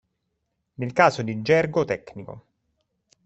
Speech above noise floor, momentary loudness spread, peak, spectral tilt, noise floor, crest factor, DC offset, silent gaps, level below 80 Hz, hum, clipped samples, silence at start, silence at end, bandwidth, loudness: 54 dB; 20 LU; -2 dBFS; -6 dB/octave; -77 dBFS; 22 dB; under 0.1%; none; -60 dBFS; none; under 0.1%; 0.8 s; 0.85 s; 8.2 kHz; -22 LUFS